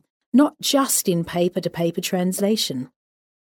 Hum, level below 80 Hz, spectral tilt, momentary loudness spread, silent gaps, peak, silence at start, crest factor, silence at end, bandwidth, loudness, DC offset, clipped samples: none; -62 dBFS; -4 dB/octave; 6 LU; none; -6 dBFS; 0.35 s; 16 dB; 0.65 s; 19.5 kHz; -21 LUFS; under 0.1%; under 0.1%